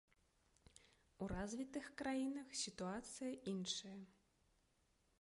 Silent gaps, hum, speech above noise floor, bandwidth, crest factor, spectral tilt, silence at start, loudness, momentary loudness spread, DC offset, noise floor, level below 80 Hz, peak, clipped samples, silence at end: none; none; 33 dB; 11.5 kHz; 18 dB; -4 dB/octave; 1.2 s; -47 LUFS; 12 LU; under 0.1%; -80 dBFS; -68 dBFS; -30 dBFS; under 0.1%; 1.1 s